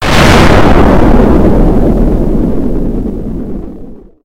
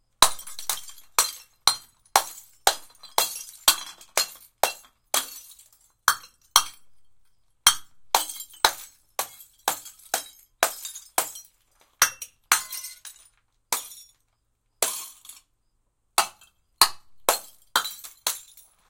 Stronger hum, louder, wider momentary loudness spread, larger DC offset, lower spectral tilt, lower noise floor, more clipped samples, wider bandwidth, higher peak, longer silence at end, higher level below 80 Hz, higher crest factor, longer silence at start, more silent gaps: neither; first, -8 LUFS vs -25 LUFS; about the same, 15 LU vs 16 LU; neither; first, -6.5 dB/octave vs 1.5 dB/octave; second, -27 dBFS vs -72 dBFS; first, 5% vs under 0.1%; about the same, 16 kHz vs 17 kHz; about the same, 0 dBFS vs 0 dBFS; second, 0 s vs 0.5 s; first, -12 dBFS vs -58 dBFS; second, 6 dB vs 28 dB; second, 0 s vs 0.2 s; neither